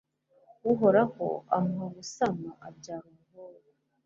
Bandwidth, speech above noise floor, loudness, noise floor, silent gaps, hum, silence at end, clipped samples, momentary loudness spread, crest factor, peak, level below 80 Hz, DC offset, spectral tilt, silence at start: 7.8 kHz; 36 dB; -28 LUFS; -64 dBFS; none; none; 0.55 s; under 0.1%; 21 LU; 20 dB; -10 dBFS; -70 dBFS; under 0.1%; -6.5 dB/octave; 0.65 s